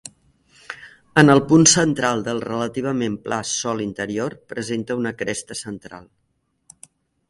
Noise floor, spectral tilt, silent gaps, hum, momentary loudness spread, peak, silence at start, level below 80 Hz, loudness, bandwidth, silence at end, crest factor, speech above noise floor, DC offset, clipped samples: -70 dBFS; -4 dB/octave; none; none; 23 LU; 0 dBFS; 0.05 s; -56 dBFS; -19 LUFS; 11.5 kHz; 1.25 s; 22 dB; 50 dB; under 0.1%; under 0.1%